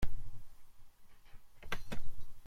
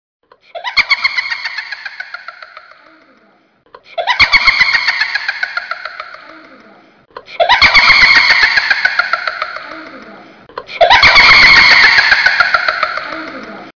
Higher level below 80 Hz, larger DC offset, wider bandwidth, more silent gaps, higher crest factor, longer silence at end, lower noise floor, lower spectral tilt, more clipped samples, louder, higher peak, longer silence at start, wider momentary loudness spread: second, -46 dBFS vs -38 dBFS; neither; first, 7 kHz vs 5.4 kHz; neither; about the same, 12 dB vs 12 dB; about the same, 0 s vs 0.05 s; about the same, -53 dBFS vs -51 dBFS; first, -5 dB/octave vs -1 dB/octave; second, under 0.1% vs 0.4%; second, -48 LUFS vs -7 LUFS; second, -20 dBFS vs 0 dBFS; second, 0 s vs 0.55 s; about the same, 24 LU vs 23 LU